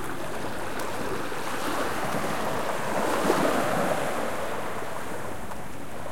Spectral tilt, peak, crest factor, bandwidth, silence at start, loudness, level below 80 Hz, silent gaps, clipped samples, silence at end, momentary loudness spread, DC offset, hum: -4 dB/octave; -8 dBFS; 22 dB; 16.5 kHz; 0 s; -29 LUFS; -54 dBFS; none; under 0.1%; 0 s; 11 LU; 3%; none